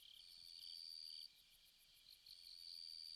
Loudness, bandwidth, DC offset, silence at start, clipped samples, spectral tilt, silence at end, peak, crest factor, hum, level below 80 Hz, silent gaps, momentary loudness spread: -55 LUFS; 15 kHz; under 0.1%; 0 s; under 0.1%; 2 dB/octave; 0 s; -44 dBFS; 14 dB; none; -86 dBFS; none; 15 LU